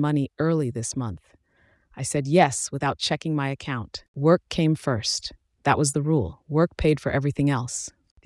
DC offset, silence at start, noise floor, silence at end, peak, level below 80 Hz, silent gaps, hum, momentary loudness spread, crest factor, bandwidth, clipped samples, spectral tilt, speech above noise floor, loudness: under 0.1%; 0 s; -63 dBFS; 0.35 s; -6 dBFS; -48 dBFS; 4.08-4.14 s; none; 11 LU; 20 dB; 12 kHz; under 0.1%; -5 dB/octave; 39 dB; -24 LUFS